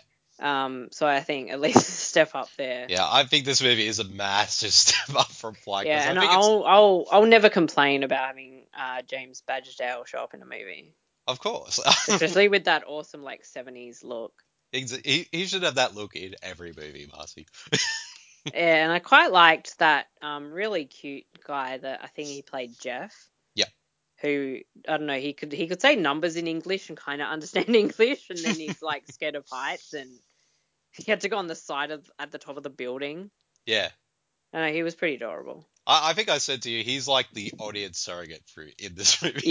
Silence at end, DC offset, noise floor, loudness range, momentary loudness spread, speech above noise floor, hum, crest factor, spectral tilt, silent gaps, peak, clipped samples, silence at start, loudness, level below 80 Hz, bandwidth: 0 s; under 0.1%; -78 dBFS; 13 LU; 21 LU; 53 dB; none; 24 dB; -2 dB/octave; none; 0 dBFS; under 0.1%; 0.4 s; -23 LUFS; -66 dBFS; 7.8 kHz